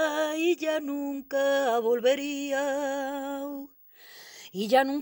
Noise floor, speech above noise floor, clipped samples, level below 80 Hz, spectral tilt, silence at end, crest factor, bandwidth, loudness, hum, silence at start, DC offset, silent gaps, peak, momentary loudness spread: -51 dBFS; 24 dB; under 0.1%; -74 dBFS; -3.5 dB/octave; 0 s; 18 dB; over 20 kHz; -28 LUFS; none; 0 s; under 0.1%; none; -10 dBFS; 18 LU